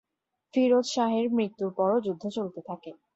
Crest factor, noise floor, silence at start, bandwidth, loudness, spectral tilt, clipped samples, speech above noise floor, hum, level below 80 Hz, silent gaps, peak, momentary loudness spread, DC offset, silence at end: 16 dB; -82 dBFS; 0.55 s; 8 kHz; -27 LUFS; -5.5 dB/octave; under 0.1%; 55 dB; none; -74 dBFS; none; -12 dBFS; 14 LU; under 0.1%; 0.2 s